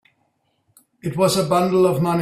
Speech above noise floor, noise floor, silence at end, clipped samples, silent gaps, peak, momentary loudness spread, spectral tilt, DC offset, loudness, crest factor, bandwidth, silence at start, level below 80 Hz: 50 dB; -68 dBFS; 0 s; under 0.1%; none; -4 dBFS; 11 LU; -6 dB/octave; under 0.1%; -18 LUFS; 16 dB; 16 kHz; 1.05 s; -56 dBFS